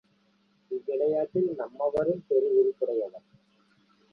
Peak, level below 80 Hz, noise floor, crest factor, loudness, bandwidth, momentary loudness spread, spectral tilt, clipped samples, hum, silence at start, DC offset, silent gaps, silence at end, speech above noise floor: -14 dBFS; -68 dBFS; -67 dBFS; 16 dB; -28 LUFS; 4.9 kHz; 10 LU; -10 dB/octave; under 0.1%; none; 0.7 s; under 0.1%; none; 0.95 s; 41 dB